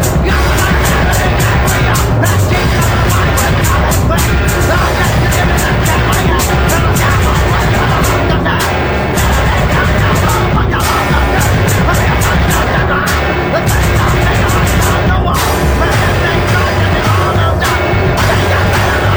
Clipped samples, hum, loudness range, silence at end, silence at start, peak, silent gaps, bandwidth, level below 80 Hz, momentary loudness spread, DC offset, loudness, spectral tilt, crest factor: under 0.1%; none; 0 LU; 0 s; 0 s; 0 dBFS; none; over 20 kHz; -16 dBFS; 1 LU; under 0.1%; -11 LUFS; -5 dB/octave; 10 dB